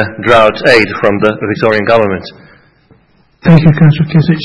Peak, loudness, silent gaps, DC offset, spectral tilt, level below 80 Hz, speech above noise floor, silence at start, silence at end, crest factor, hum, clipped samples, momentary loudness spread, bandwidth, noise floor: 0 dBFS; -9 LUFS; none; under 0.1%; -7.5 dB/octave; -38 dBFS; 39 dB; 0 s; 0 s; 10 dB; none; 2%; 6 LU; 9.4 kHz; -48 dBFS